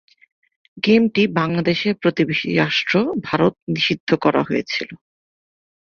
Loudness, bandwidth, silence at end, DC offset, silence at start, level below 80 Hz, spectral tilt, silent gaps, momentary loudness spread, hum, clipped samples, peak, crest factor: -19 LUFS; 7 kHz; 1 s; under 0.1%; 0.75 s; -58 dBFS; -6.5 dB/octave; 3.62-3.67 s, 4.00-4.07 s; 6 LU; none; under 0.1%; -2 dBFS; 18 dB